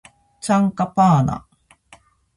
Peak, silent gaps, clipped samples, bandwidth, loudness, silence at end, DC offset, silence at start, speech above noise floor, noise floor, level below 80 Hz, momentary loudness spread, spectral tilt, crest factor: -4 dBFS; none; under 0.1%; 11.5 kHz; -18 LUFS; 1 s; under 0.1%; 0.45 s; 35 dB; -52 dBFS; -48 dBFS; 15 LU; -7 dB/octave; 16 dB